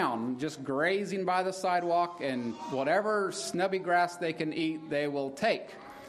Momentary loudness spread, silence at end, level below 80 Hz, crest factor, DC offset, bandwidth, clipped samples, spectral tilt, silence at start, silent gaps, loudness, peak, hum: 6 LU; 0 s; -76 dBFS; 16 dB; under 0.1%; 14 kHz; under 0.1%; -4.5 dB/octave; 0 s; none; -31 LUFS; -14 dBFS; none